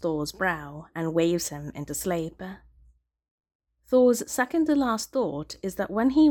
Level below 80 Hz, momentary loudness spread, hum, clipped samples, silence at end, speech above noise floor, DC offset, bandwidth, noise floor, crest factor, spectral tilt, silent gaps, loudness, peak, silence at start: -54 dBFS; 13 LU; none; under 0.1%; 0 s; 35 dB; under 0.1%; 18 kHz; -60 dBFS; 16 dB; -5 dB/octave; 3.31-3.38 s, 3.55-3.60 s; -26 LUFS; -10 dBFS; 0 s